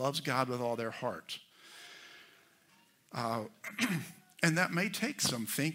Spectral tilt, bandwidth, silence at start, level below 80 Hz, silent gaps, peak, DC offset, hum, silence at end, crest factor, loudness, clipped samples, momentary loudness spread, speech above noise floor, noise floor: -4 dB/octave; 16 kHz; 0 s; -80 dBFS; none; -12 dBFS; under 0.1%; none; 0 s; 26 dB; -34 LUFS; under 0.1%; 20 LU; 32 dB; -67 dBFS